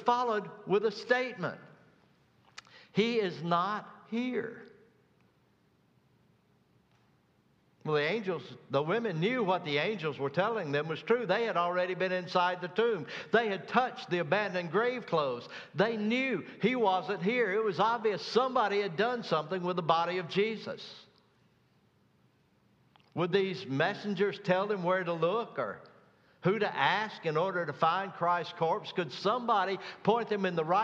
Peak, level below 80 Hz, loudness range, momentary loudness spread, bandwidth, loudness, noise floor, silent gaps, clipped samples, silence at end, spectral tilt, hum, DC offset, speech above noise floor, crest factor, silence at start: -10 dBFS; -80 dBFS; 7 LU; 8 LU; 7.8 kHz; -31 LUFS; -69 dBFS; none; under 0.1%; 0 s; -6 dB/octave; none; under 0.1%; 38 dB; 22 dB; 0 s